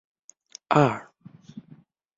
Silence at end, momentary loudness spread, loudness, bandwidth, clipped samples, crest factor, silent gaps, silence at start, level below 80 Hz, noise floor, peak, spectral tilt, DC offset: 0.6 s; 26 LU; -23 LUFS; 7.8 kHz; under 0.1%; 24 dB; none; 0.7 s; -64 dBFS; -54 dBFS; -4 dBFS; -6.5 dB/octave; under 0.1%